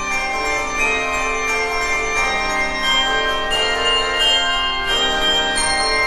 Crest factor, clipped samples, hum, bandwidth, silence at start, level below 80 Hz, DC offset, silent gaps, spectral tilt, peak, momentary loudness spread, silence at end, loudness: 14 dB; under 0.1%; none; 13.5 kHz; 0 s; -34 dBFS; under 0.1%; none; -1 dB/octave; -4 dBFS; 4 LU; 0 s; -17 LUFS